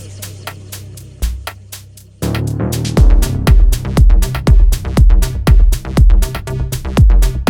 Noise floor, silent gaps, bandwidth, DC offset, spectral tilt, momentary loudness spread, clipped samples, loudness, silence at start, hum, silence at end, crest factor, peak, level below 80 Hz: -35 dBFS; none; 16.5 kHz; under 0.1%; -6 dB/octave; 17 LU; under 0.1%; -14 LUFS; 0 s; none; 0 s; 10 dB; 0 dBFS; -12 dBFS